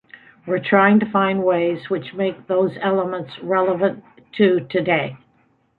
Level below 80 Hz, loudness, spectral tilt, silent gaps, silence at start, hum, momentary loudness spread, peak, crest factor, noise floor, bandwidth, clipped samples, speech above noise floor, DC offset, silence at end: -62 dBFS; -19 LUFS; -9.5 dB/octave; none; 0.45 s; none; 11 LU; -2 dBFS; 18 dB; -61 dBFS; 4.5 kHz; under 0.1%; 42 dB; under 0.1%; 0.65 s